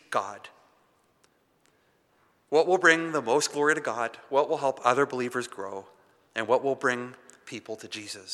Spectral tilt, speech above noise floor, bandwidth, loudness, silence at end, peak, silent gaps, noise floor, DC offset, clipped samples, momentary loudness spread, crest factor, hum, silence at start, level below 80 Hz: -3 dB/octave; 40 dB; 13.5 kHz; -26 LUFS; 0 s; -4 dBFS; none; -67 dBFS; under 0.1%; under 0.1%; 18 LU; 24 dB; none; 0.1 s; -84 dBFS